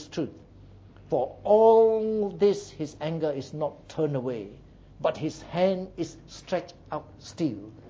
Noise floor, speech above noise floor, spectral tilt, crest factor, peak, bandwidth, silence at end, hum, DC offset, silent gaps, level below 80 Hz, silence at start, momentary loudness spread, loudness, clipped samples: -50 dBFS; 24 dB; -6.5 dB/octave; 18 dB; -8 dBFS; 7.8 kHz; 0 s; none; under 0.1%; none; -56 dBFS; 0 s; 17 LU; -27 LUFS; under 0.1%